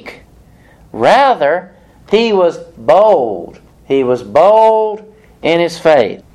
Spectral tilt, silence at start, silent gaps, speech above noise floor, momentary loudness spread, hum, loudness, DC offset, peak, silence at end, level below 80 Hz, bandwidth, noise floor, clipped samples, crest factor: -5.5 dB/octave; 0.05 s; none; 32 dB; 11 LU; none; -11 LUFS; under 0.1%; 0 dBFS; 0.2 s; -48 dBFS; 12 kHz; -43 dBFS; under 0.1%; 12 dB